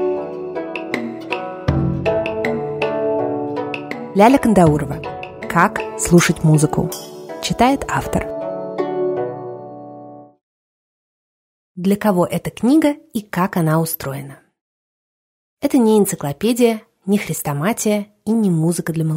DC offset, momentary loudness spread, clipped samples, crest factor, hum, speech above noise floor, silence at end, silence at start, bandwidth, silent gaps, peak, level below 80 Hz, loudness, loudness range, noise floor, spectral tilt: under 0.1%; 13 LU; under 0.1%; 18 dB; none; 22 dB; 0 s; 0 s; 16 kHz; 10.43-11.75 s, 14.61-15.57 s; 0 dBFS; -42 dBFS; -18 LUFS; 8 LU; -38 dBFS; -6 dB/octave